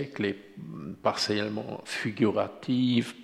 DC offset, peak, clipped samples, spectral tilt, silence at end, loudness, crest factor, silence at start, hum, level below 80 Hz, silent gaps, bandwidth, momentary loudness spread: under 0.1%; -12 dBFS; under 0.1%; -5.5 dB/octave; 0 s; -29 LUFS; 18 dB; 0 s; none; -70 dBFS; none; 13 kHz; 14 LU